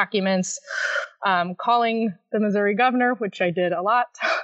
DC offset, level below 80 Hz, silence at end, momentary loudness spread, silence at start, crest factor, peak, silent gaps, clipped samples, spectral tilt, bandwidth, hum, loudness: under 0.1%; -82 dBFS; 0 s; 6 LU; 0 s; 18 dB; -6 dBFS; none; under 0.1%; -4.5 dB/octave; 8.2 kHz; none; -22 LUFS